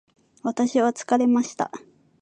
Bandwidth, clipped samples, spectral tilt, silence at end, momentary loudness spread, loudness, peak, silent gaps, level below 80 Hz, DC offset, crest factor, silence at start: 9.2 kHz; under 0.1%; -4.5 dB/octave; 0.45 s; 11 LU; -23 LUFS; -6 dBFS; none; -74 dBFS; under 0.1%; 18 dB; 0.45 s